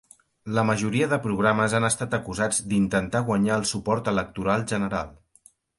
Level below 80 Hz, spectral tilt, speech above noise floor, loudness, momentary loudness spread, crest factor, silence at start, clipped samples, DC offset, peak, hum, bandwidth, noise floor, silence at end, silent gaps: -50 dBFS; -5 dB/octave; 34 dB; -24 LUFS; 6 LU; 20 dB; 0.45 s; under 0.1%; under 0.1%; -6 dBFS; none; 11.5 kHz; -58 dBFS; 0.65 s; none